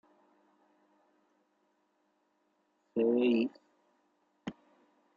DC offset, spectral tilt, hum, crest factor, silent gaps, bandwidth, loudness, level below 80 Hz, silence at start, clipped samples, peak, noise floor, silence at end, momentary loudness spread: under 0.1%; -5 dB/octave; none; 20 dB; none; 7 kHz; -31 LUFS; -82 dBFS; 2.95 s; under 0.1%; -18 dBFS; -76 dBFS; 0.65 s; 19 LU